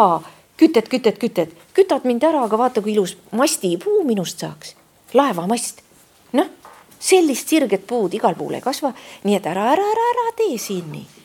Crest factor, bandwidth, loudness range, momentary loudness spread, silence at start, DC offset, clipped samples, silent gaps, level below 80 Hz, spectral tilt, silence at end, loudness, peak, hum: 18 dB; 18 kHz; 3 LU; 11 LU; 0 s; under 0.1%; under 0.1%; none; -68 dBFS; -4.5 dB/octave; 0.2 s; -19 LUFS; 0 dBFS; none